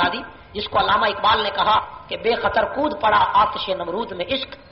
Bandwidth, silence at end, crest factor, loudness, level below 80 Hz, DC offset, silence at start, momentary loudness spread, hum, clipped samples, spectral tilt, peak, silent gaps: 5.8 kHz; 0.15 s; 14 dB; -20 LUFS; -46 dBFS; under 0.1%; 0 s; 9 LU; none; under 0.1%; -0.5 dB/octave; -6 dBFS; none